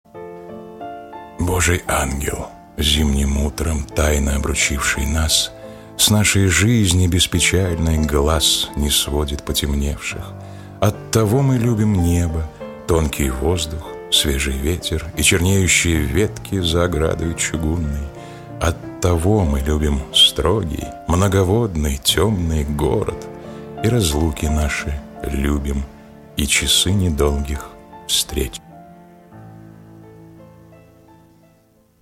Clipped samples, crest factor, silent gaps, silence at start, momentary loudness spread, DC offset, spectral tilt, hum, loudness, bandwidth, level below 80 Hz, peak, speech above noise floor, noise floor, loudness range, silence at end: under 0.1%; 18 dB; none; 0.15 s; 17 LU; under 0.1%; -4 dB/octave; none; -18 LUFS; 16.5 kHz; -26 dBFS; -2 dBFS; 38 dB; -55 dBFS; 5 LU; 1.55 s